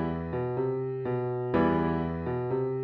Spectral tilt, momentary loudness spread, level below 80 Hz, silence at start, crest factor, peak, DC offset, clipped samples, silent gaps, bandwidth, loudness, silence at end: -10.5 dB/octave; 6 LU; -50 dBFS; 0 s; 16 dB; -14 dBFS; under 0.1%; under 0.1%; none; 5.2 kHz; -30 LUFS; 0 s